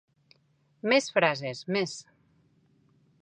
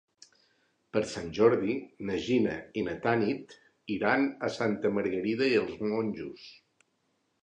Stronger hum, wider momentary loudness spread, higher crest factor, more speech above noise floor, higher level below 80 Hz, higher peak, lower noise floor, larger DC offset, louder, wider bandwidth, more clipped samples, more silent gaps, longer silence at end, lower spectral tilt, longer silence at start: neither; about the same, 12 LU vs 12 LU; about the same, 24 dB vs 22 dB; second, 41 dB vs 46 dB; second, -78 dBFS vs -64 dBFS; about the same, -8 dBFS vs -10 dBFS; second, -68 dBFS vs -75 dBFS; neither; first, -27 LUFS vs -30 LUFS; about the same, 10 kHz vs 9.8 kHz; neither; neither; first, 1.2 s vs 0.9 s; second, -4 dB/octave vs -6 dB/octave; about the same, 0.85 s vs 0.95 s